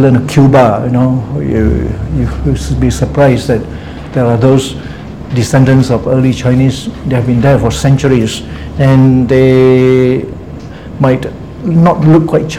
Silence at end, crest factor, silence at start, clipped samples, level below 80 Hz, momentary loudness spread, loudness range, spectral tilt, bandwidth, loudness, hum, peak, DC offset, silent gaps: 0 s; 10 dB; 0 s; 1%; -26 dBFS; 14 LU; 3 LU; -7.5 dB/octave; 12.5 kHz; -10 LUFS; none; 0 dBFS; 0.8%; none